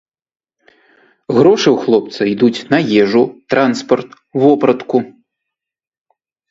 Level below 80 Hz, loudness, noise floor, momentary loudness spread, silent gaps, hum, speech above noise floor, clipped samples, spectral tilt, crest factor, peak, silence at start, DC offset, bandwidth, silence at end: -58 dBFS; -13 LUFS; -80 dBFS; 7 LU; none; none; 68 dB; under 0.1%; -6 dB/octave; 14 dB; 0 dBFS; 1.3 s; under 0.1%; 7.8 kHz; 1.4 s